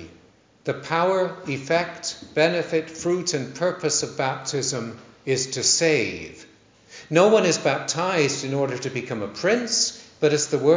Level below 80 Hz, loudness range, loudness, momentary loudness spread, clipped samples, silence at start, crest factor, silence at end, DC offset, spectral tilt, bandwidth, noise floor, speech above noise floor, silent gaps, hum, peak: -62 dBFS; 3 LU; -23 LUFS; 12 LU; under 0.1%; 0 s; 20 dB; 0 s; under 0.1%; -3.5 dB/octave; 7.8 kHz; -55 dBFS; 32 dB; none; none; -4 dBFS